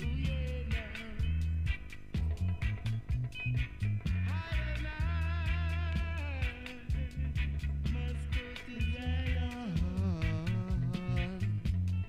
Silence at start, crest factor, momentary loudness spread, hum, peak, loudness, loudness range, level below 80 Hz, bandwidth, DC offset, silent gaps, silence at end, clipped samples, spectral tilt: 0 s; 12 dB; 4 LU; none; -20 dBFS; -36 LUFS; 2 LU; -38 dBFS; 10 kHz; under 0.1%; none; 0 s; under 0.1%; -7 dB/octave